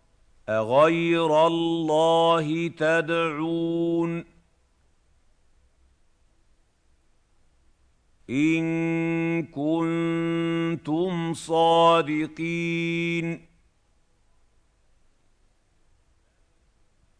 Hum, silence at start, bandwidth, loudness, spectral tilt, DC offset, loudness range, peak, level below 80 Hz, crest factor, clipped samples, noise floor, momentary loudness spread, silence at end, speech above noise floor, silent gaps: none; 0.5 s; 10.5 kHz; -24 LUFS; -6 dB/octave; under 0.1%; 11 LU; -8 dBFS; -62 dBFS; 18 dB; under 0.1%; -64 dBFS; 9 LU; 3.8 s; 41 dB; none